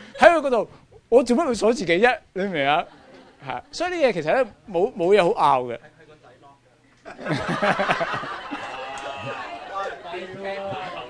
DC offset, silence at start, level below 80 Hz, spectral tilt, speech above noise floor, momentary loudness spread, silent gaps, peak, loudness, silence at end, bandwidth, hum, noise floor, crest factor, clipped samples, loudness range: under 0.1%; 0 s; -54 dBFS; -5 dB/octave; 35 dB; 15 LU; none; 0 dBFS; -22 LUFS; 0 s; 10.5 kHz; none; -57 dBFS; 24 dB; under 0.1%; 6 LU